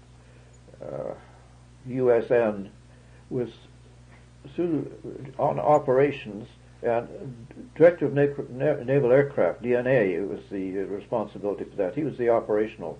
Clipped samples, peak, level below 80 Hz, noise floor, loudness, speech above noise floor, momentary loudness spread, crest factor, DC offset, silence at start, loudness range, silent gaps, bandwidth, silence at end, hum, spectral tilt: under 0.1%; -6 dBFS; -56 dBFS; -51 dBFS; -25 LUFS; 26 dB; 18 LU; 20 dB; under 0.1%; 0.8 s; 6 LU; none; 9.6 kHz; 0 s; none; -8.5 dB/octave